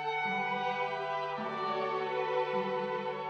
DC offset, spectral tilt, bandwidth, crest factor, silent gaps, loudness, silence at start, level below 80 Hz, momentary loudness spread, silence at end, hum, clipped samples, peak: under 0.1%; -5.5 dB/octave; 8 kHz; 14 dB; none; -33 LUFS; 0 s; -82 dBFS; 3 LU; 0 s; none; under 0.1%; -20 dBFS